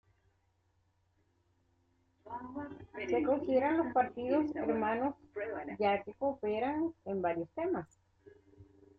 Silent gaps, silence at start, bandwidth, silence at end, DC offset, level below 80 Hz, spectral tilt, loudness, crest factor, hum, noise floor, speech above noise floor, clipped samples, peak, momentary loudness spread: none; 2.25 s; 7.4 kHz; 0.35 s; under 0.1%; -70 dBFS; -7.5 dB/octave; -35 LUFS; 18 dB; none; -75 dBFS; 41 dB; under 0.1%; -18 dBFS; 13 LU